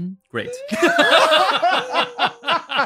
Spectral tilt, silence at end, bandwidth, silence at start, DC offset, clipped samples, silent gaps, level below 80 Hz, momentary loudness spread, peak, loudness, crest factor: -3 dB/octave; 0 s; 16 kHz; 0 s; under 0.1%; under 0.1%; none; -68 dBFS; 15 LU; -2 dBFS; -17 LUFS; 16 dB